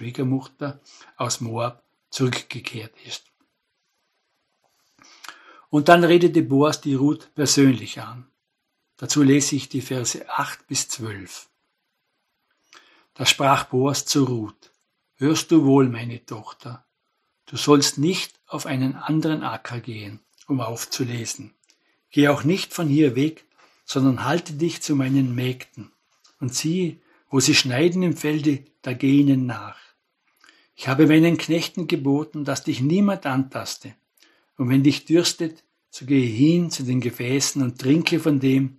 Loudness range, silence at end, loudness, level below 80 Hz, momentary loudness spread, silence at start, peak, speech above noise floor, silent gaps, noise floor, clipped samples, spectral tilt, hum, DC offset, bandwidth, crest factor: 8 LU; 0.05 s; -21 LUFS; -68 dBFS; 18 LU; 0 s; 0 dBFS; 55 dB; none; -76 dBFS; under 0.1%; -5 dB/octave; none; under 0.1%; 13 kHz; 22 dB